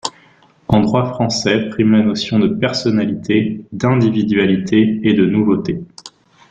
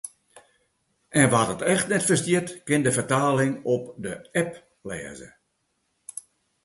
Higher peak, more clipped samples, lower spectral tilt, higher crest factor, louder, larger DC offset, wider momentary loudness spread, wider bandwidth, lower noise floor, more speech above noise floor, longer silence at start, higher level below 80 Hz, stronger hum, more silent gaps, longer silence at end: about the same, -2 dBFS vs -4 dBFS; neither; first, -6 dB/octave vs -4.5 dB/octave; second, 14 dB vs 22 dB; first, -15 LUFS vs -24 LUFS; neither; second, 7 LU vs 19 LU; second, 9.2 kHz vs 12 kHz; second, -50 dBFS vs -74 dBFS; second, 35 dB vs 50 dB; about the same, 0.05 s vs 0.05 s; first, -48 dBFS vs -60 dBFS; neither; neither; about the same, 0.45 s vs 0.45 s